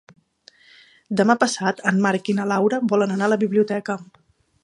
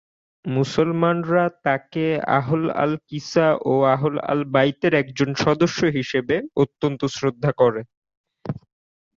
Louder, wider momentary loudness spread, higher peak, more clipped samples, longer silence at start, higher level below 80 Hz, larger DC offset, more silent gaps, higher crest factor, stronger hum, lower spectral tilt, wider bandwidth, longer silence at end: about the same, -21 LUFS vs -21 LUFS; about the same, 8 LU vs 7 LU; about the same, -2 dBFS vs -4 dBFS; neither; first, 1.1 s vs 0.45 s; second, -70 dBFS vs -56 dBFS; neither; second, none vs 7.97-8.02 s, 8.17-8.24 s; about the same, 20 dB vs 16 dB; neither; about the same, -5.5 dB/octave vs -6.5 dB/octave; first, 11 kHz vs 7.8 kHz; about the same, 0.6 s vs 0.6 s